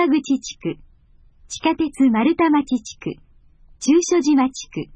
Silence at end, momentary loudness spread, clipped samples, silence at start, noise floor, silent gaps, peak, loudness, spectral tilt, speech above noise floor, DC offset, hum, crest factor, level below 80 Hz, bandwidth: 0.1 s; 15 LU; under 0.1%; 0 s; -51 dBFS; none; -6 dBFS; -19 LUFS; -4.5 dB/octave; 33 dB; under 0.1%; none; 14 dB; -52 dBFS; 10 kHz